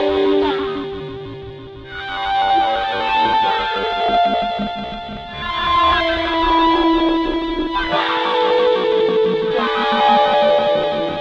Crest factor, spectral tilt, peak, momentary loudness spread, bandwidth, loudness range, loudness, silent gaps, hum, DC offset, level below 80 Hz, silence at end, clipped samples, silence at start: 14 dB; -5.5 dB/octave; -4 dBFS; 14 LU; 8 kHz; 4 LU; -17 LUFS; none; none; under 0.1%; -38 dBFS; 0 s; under 0.1%; 0 s